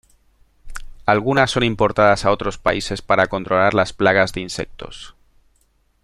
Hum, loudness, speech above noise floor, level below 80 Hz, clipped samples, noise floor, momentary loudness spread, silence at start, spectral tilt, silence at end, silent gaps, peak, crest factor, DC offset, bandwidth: none; -18 LUFS; 43 dB; -40 dBFS; under 0.1%; -61 dBFS; 20 LU; 0.65 s; -5 dB/octave; 0.95 s; none; -2 dBFS; 18 dB; under 0.1%; 13.5 kHz